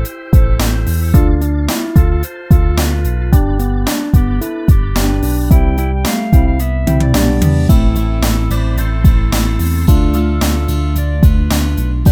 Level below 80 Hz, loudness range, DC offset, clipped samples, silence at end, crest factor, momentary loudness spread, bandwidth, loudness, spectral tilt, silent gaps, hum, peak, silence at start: -14 dBFS; 1 LU; under 0.1%; under 0.1%; 0 s; 12 dB; 4 LU; 18.5 kHz; -14 LUFS; -6.5 dB/octave; none; none; 0 dBFS; 0 s